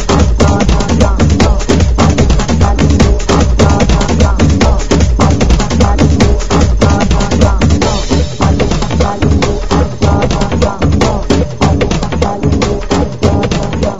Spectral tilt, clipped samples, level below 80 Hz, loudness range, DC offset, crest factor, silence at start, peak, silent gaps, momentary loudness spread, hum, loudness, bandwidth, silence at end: -6 dB/octave; 0.8%; -14 dBFS; 2 LU; 8%; 10 dB; 0 s; 0 dBFS; none; 4 LU; none; -11 LUFS; 7.8 kHz; 0 s